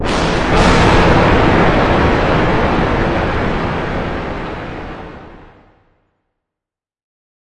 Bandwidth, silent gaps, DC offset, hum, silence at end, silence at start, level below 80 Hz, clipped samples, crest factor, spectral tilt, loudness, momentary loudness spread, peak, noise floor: 11 kHz; none; under 0.1%; none; 0.4 s; 0 s; -24 dBFS; under 0.1%; 14 dB; -6 dB/octave; -13 LUFS; 16 LU; 0 dBFS; -87 dBFS